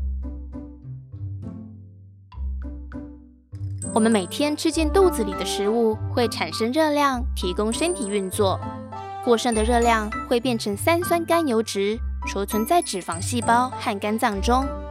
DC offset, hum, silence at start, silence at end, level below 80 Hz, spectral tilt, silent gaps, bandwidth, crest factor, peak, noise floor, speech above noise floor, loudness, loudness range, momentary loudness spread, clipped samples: under 0.1%; none; 0 s; 0 s; -36 dBFS; -4.5 dB/octave; none; 16 kHz; 18 dB; -6 dBFS; -46 dBFS; 24 dB; -22 LUFS; 6 LU; 16 LU; under 0.1%